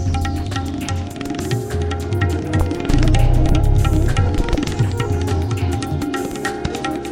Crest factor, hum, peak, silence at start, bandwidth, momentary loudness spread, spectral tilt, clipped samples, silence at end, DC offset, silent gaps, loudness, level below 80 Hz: 14 dB; none; -2 dBFS; 0 s; 16 kHz; 7 LU; -6.5 dB/octave; under 0.1%; 0 s; under 0.1%; none; -20 LUFS; -22 dBFS